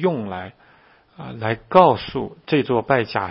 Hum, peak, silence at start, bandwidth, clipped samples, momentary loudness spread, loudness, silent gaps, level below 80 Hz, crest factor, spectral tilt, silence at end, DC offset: none; 0 dBFS; 0 s; 5.8 kHz; under 0.1%; 20 LU; -20 LUFS; none; -54 dBFS; 20 dB; -9.5 dB/octave; 0 s; under 0.1%